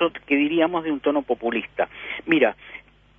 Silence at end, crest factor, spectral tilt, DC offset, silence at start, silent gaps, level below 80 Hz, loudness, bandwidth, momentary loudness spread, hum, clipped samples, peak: 0.4 s; 18 dB; -7.5 dB/octave; under 0.1%; 0 s; none; -58 dBFS; -23 LUFS; 3.7 kHz; 14 LU; 50 Hz at -60 dBFS; under 0.1%; -4 dBFS